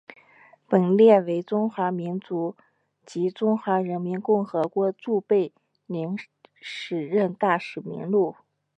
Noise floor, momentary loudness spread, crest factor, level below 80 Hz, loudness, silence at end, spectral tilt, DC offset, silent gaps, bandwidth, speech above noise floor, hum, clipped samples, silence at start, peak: -55 dBFS; 14 LU; 20 dB; -80 dBFS; -24 LUFS; 0.45 s; -8 dB/octave; under 0.1%; none; 8.6 kHz; 32 dB; none; under 0.1%; 0.7 s; -4 dBFS